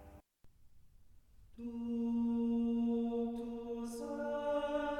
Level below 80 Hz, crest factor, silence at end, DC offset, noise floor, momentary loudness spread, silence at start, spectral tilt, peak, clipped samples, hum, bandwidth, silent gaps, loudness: -62 dBFS; 12 dB; 0 s; under 0.1%; -62 dBFS; 9 LU; 0 s; -6.5 dB/octave; -26 dBFS; under 0.1%; none; 12 kHz; none; -38 LUFS